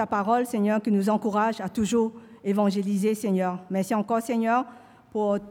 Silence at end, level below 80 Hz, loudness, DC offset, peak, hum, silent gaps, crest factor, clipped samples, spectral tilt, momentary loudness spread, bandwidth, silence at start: 0 s; -64 dBFS; -25 LUFS; under 0.1%; -10 dBFS; none; none; 14 dB; under 0.1%; -6.5 dB/octave; 5 LU; 16 kHz; 0 s